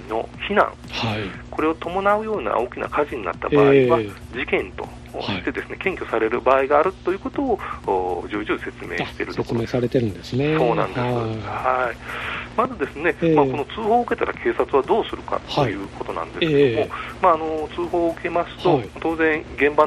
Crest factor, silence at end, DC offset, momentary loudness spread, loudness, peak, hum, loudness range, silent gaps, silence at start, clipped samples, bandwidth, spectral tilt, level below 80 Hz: 18 dB; 0 s; under 0.1%; 9 LU; -22 LUFS; -2 dBFS; 60 Hz at -40 dBFS; 3 LU; none; 0 s; under 0.1%; 12.5 kHz; -7 dB/octave; -44 dBFS